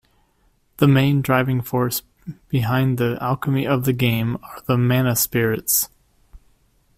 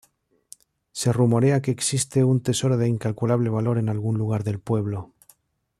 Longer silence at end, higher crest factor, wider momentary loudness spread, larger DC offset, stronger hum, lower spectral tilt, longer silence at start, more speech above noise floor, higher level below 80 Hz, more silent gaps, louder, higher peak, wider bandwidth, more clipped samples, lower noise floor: second, 0.6 s vs 0.75 s; about the same, 18 dB vs 16 dB; first, 9 LU vs 6 LU; neither; neither; about the same, -5.5 dB/octave vs -6 dB/octave; second, 0.8 s vs 0.95 s; about the same, 42 dB vs 43 dB; first, -50 dBFS vs -58 dBFS; neither; first, -20 LUFS vs -23 LUFS; first, -2 dBFS vs -8 dBFS; first, 16 kHz vs 13 kHz; neither; about the same, -62 dBFS vs -65 dBFS